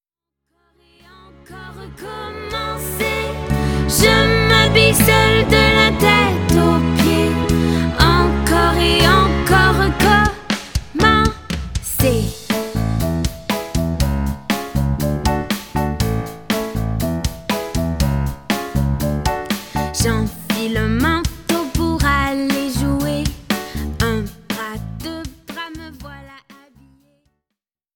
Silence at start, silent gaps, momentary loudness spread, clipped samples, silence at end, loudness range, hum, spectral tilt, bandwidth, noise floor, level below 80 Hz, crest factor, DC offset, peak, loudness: 1.5 s; none; 15 LU; under 0.1%; 1.55 s; 12 LU; none; -4.5 dB/octave; 19.5 kHz; -82 dBFS; -28 dBFS; 18 dB; under 0.1%; 0 dBFS; -17 LUFS